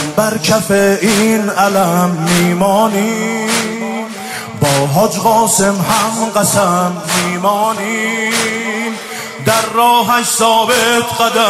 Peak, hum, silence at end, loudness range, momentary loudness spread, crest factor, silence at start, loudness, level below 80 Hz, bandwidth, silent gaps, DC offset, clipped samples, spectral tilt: 0 dBFS; none; 0 s; 2 LU; 8 LU; 12 dB; 0 s; -13 LUFS; -50 dBFS; 16 kHz; none; under 0.1%; under 0.1%; -3.5 dB/octave